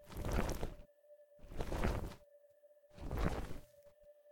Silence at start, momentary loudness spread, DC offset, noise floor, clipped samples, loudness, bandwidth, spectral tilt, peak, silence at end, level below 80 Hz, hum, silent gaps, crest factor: 0 s; 24 LU; under 0.1%; -66 dBFS; under 0.1%; -43 LUFS; 18 kHz; -6 dB/octave; -20 dBFS; 0 s; -46 dBFS; none; none; 22 dB